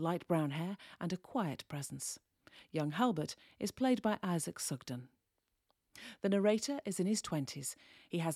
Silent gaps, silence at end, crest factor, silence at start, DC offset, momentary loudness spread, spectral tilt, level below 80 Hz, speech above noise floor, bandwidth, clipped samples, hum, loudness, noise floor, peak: none; 0 s; 18 dB; 0 s; under 0.1%; 11 LU; -5 dB/octave; -74 dBFS; 47 dB; 16 kHz; under 0.1%; none; -37 LUFS; -84 dBFS; -18 dBFS